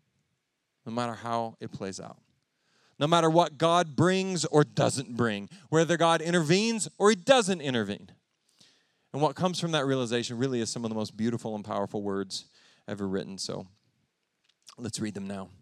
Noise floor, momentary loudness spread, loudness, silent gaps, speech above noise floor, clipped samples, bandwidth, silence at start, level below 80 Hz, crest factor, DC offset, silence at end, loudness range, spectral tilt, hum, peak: -80 dBFS; 14 LU; -28 LUFS; none; 52 dB; under 0.1%; 13.5 kHz; 0.85 s; -72 dBFS; 24 dB; under 0.1%; 0.15 s; 10 LU; -5 dB/octave; none; -6 dBFS